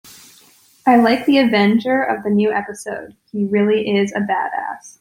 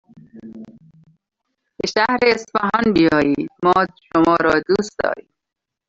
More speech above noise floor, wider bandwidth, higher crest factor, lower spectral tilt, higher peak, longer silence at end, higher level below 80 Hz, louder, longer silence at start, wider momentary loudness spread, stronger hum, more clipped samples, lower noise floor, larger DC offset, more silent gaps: second, 34 dB vs 66 dB; first, 16 kHz vs 7.8 kHz; about the same, 16 dB vs 16 dB; about the same, -6 dB/octave vs -5.5 dB/octave; about the same, -2 dBFS vs -2 dBFS; second, 0.1 s vs 0.7 s; second, -60 dBFS vs -52 dBFS; about the same, -17 LUFS vs -17 LUFS; first, 0.85 s vs 0.15 s; first, 15 LU vs 12 LU; neither; neither; second, -51 dBFS vs -83 dBFS; neither; neither